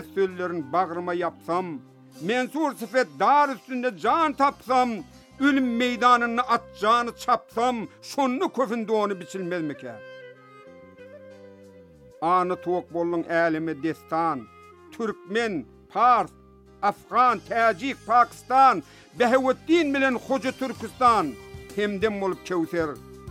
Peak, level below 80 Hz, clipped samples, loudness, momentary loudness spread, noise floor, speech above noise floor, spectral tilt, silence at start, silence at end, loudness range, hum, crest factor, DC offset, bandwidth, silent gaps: -6 dBFS; -60 dBFS; under 0.1%; -24 LUFS; 12 LU; -49 dBFS; 26 dB; -5 dB/octave; 0 s; 0 s; 7 LU; none; 18 dB; under 0.1%; 16 kHz; none